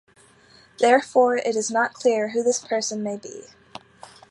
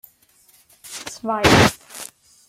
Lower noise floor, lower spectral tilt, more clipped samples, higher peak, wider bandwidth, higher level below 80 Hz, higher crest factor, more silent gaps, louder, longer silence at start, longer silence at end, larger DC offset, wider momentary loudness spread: about the same, -54 dBFS vs -56 dBFS; about the same, -3 dB/octave vs -4 dB/octave; neither; second, -4 dBFS vs 0 dBFS; second, 11.5 kHz vs 16.5 kHz; second, -70 dBFS vs -42 dBFS; about the same, 20 dB vs 22 dB; neither; second, -22 LUFS vs -17 LUFS; about the same, 0.8 s vs 0.9 s; first, 0.9 s vs 0.4 s; neither; about the same, 21 LU vs 22 LU